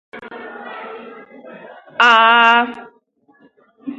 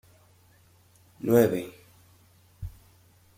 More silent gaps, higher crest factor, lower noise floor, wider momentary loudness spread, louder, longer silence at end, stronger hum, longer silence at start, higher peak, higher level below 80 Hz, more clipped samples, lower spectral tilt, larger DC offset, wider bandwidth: neither; second, 18 dB vs 24 dB; second, -56 dBFS vs -60 dBFS; first, 25 LU vs 22 LU; first, -11 LUFS vs -25 LUFS; second, 0.05 s vs 0.7 s; neither; second, 0.15 s vs 1.25 s; first, 0 dBFS vs -6 dBFS; second, -72 dBFS vs -54 dBFS; neither; second, -2 dB/octave vs -7 dB/octave; neither; second, 8.8 kHz vs 16.5 kHz